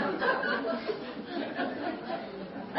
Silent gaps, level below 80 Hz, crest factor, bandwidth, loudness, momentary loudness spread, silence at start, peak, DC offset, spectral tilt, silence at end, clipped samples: none; -68 dBFS; 18 dB; 5.6 kHz; -33 LUFS; 9 LU; 0 s; -14 dBFS; under 0.1%; -2.5 dB/octave; 0 s; under 0.1%